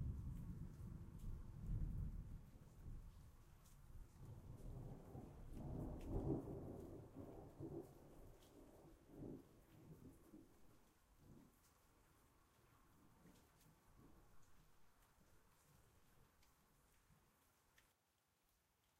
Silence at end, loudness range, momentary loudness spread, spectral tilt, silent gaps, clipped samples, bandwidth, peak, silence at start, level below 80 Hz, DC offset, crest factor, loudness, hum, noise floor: 1.15 s; 12 LU; 18 LU; -8.5 dB/octave; none; under 0.1%; 15.5 kHz; -32 dBFS; 0 s; -60 dBFS; under 0.1%; 24 dB; -55 LUFS; none; -85 dBFS